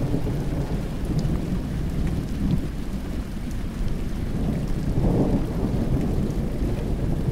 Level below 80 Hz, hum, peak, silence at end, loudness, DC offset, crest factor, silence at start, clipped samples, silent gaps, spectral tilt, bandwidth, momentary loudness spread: -28 dBFS; none; -8 dBFS; 0 s; -27 LUFS; under 0.1%; 16 dB; 0 s; under 0.1%; none; -8 dB/octave; 16 kHz; 7 LU